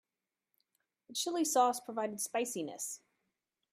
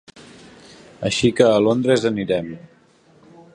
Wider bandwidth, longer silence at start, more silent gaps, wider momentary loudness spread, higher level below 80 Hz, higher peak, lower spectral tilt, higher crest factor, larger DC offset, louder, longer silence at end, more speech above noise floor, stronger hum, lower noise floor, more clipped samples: first, 16 kHz vs 10.5 kHz; first, 1.1 s vs 0.2 s; neither; about the same, 12 LU vs 14 LU; second, -90 dBFS vs -54 dBFS; second, -16 dBFS vs 0 dBFS; second, -2 dB/octave vs -5.5 dB/octave; about the same, 22 dB vs 20 dB; neither; second, -35 LUFS vs -18 LUFS; second, 0.75 s vs 0.95 s; first, over 55 dB vs 36 dB; neither; first, under -90 dBFS vs -54 dBFS; neither